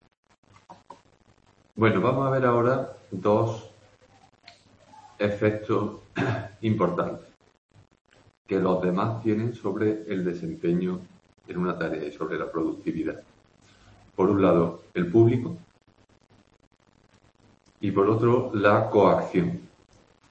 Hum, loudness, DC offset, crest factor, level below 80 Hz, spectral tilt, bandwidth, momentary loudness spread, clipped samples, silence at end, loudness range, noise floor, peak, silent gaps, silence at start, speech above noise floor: none; -25 LUFS; under 0.1%; 20 dB; -60 dBFS; -8.5 dB/octave; 8.2 kHz; 12 LU; under 0.1%; 0.65 s; 5 LU; -62 dBFS; -6 dBFS; 7.58-7.69 s, 8.01-8.05 s, 8.37-8.45 s, 16.67-16.71 s; 0.7 s; 37 dB